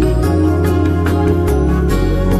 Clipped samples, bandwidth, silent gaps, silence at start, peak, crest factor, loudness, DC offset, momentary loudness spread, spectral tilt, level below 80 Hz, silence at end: under 0.1%; 14.5 kHz; none; 0 s; -2 dBFS; 10 dB; -14 LUFS; under 0.1%; 1 LU; -8 dB/octave; -18 dBFS; 0 s